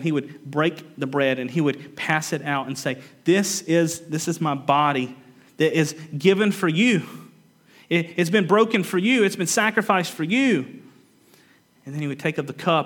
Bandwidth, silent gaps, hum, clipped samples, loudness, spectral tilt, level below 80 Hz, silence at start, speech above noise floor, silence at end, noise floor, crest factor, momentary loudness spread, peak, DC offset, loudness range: 19 kHz; none; none; under 0.1%; -22 LUFS; -4.5 dB/octave; -76 dBFS; 0 s; 35 dB; 0 s; -57 dBFS; 20 dB; 9 LU; -2 dBFS; under 0.1%; 3 LU